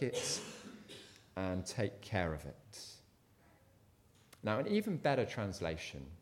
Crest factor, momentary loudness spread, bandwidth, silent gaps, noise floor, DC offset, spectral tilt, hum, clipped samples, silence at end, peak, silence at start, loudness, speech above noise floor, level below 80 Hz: 22 dB; 18 LU; 17 kHz; none; -67 dBFS; under 0.1%; -4.5 dB/octave; none; under 0.1%; 0.05 s; -18 dBFS; 0 s; -38 LUFS; 29 dB; -62 dBFS